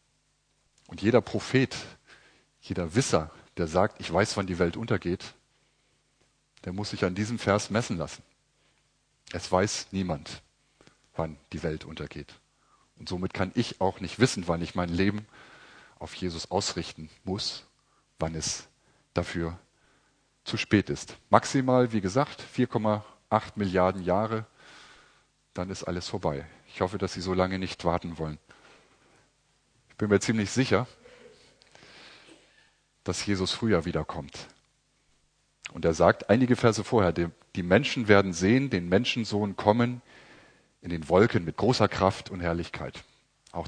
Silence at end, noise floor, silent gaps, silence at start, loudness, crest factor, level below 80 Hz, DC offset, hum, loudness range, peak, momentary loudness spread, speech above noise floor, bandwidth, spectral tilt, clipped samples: 0 s; -71 dBFS; none; 0.9 s; -28 LUFS; 28 dB; -54 dBFS; under 0.1%; none; 8 LU; -2 dBFS; 17 LU; 44 dB; 10.5 kHz; -5.5 dB/octave; under 0.1%